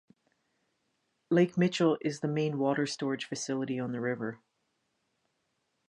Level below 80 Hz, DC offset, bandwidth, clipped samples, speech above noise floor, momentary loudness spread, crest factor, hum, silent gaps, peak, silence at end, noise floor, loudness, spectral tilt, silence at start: -78 dBFS; under 0.1%; 11 kHz; under 0.1%; 49 dB; 7 LU; 20 dB; none; none; -14 dBFS; 1.55 s; -79 dBFS; -31 LUFS; -5.5 dB/octave; 1.3 s